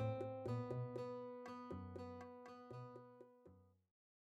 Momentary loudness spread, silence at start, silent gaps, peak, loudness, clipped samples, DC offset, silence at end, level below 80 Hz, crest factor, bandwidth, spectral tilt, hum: 18 LU; 0 s; none; -32 dBFS; -50 LUFS; under 0.1%; under 0.1%; 0.55 s; -76 dBFS; 18 dB; 8 kHz; -8.5 dB/octave; none